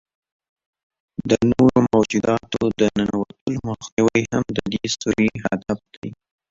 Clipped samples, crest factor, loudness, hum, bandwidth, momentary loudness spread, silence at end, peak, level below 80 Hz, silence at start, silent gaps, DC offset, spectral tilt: under 0.1%; 18 dB; -20 LUFS; none; 7.8 kHz; 13 LU; 0.35 s; -2 dBFS; -48 dBFS; 1.2 s; 3.41-3.46 s, 3.92-3.97 s, 5.97-6.02 s; under 0.1%; -5.5 dB/octave